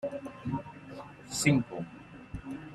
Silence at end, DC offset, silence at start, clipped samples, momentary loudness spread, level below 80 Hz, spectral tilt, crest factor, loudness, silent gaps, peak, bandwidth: 0 s; under 0.1%; 0 s; under 0.1%; 19 LU; -56 dBFS; -5 dB/octave; 22 dB; -32 LUFS; none; -12 dBFS; 15 kHz